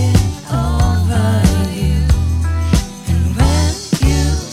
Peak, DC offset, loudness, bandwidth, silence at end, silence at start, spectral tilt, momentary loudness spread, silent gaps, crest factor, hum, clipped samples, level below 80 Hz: 0 dBFS; under 0.1%; -15 LUFS; 15.5 kHz; 0 s; 0 s; -6 dB/octave; 4 LU; none; 14 dB; none; under 0.1%; -18 dBFS